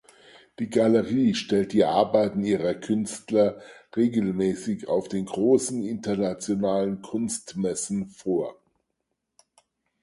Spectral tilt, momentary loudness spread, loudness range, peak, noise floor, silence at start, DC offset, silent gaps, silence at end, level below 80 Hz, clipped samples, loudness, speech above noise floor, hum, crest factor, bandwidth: -5.5 dB/octave; 8 LU; 6 LU; -8 dBFS; -80 dBFS; 0.6 s; under 0.1%; none; 1.5 s; -60 dBFS; under 0.1%; -25 LUFS; 55 dB; none; 18 dB; 11.5 kHz